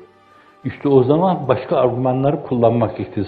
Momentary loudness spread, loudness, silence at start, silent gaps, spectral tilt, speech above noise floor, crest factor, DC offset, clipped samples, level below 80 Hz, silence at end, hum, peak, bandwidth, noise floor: 8 LU; -17 LUFS; 0 s; none; -11 dB/octave; 33 dB; 16 dB; under 0.1%; under 0.1%; -54 dBFS; 0 s; none; 0 dBFS; 4.7 kHz; -49 dBFS